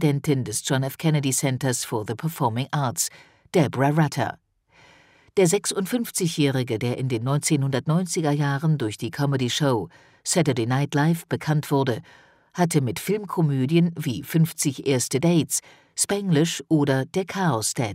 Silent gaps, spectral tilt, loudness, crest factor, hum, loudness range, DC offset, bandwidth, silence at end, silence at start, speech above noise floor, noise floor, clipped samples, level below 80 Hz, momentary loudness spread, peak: none; -5 dB/octave; -23 LUFS; 16 dB; none; 2 LU; under 0.1%; 16 kHz; 0 s; 0 s; 33 dB; -56 dBFS; under 0.1%; -64 dBFS; 6 LU; -6 dBFS